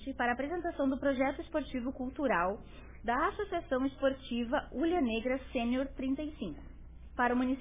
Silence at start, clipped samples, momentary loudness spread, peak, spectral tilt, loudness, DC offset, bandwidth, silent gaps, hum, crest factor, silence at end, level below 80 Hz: 0 s; under 0.1%; 12 LU; -18 dBFS; -4 dB/octave; -34 LUFS; 0.1%; 3.8 kHz; none; none; 16 dB; 0 s; -52 dBFS